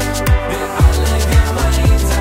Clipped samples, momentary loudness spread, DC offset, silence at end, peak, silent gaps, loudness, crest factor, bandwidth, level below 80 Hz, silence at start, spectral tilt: under 0.1%; 3 LU; under 0.1%; 0 s; 0 dBFS; none; -14 LUFS; 12 dB; 16.5 kHz; -14 dBFS; 0 s; -5 dB/octave